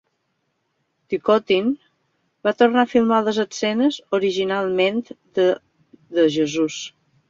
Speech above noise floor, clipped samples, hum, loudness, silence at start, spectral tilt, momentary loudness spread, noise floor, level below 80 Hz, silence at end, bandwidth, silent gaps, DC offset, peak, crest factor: 52 dB; under 0.1%; none; -20 LUFS; 1.1 s; -4.5 dB/octave; 11 LU; -72 dBFS; -64 dBFS; 0.4 s; 7.8 kHz; none; under 0.1%; -4 dBFS; 18 dB